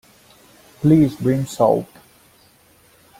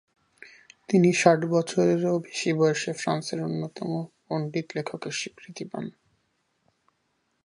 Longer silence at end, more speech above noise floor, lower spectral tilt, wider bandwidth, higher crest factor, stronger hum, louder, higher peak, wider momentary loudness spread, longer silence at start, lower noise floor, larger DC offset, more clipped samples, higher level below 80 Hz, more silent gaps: second, 1.35 s vs 1.55 s; second, 37 dB vs 48 dB; first, -8 dB/octave vs -5.5 dB/octave; first, 16 kHz vs 11.5 kHz; second, 18 dB vs 24 dB; neither; first, -18 LUFS vs -26 LUFS; about the same, -2 dBFS vs -4 dBFS; second, 8 LU vs 15 LU; first, 0.8 s vs 0.45 s; second, -53 dBFS vs -74 dBFS; neither; neither; first, -52 dBFS vs -74 dBFS; neither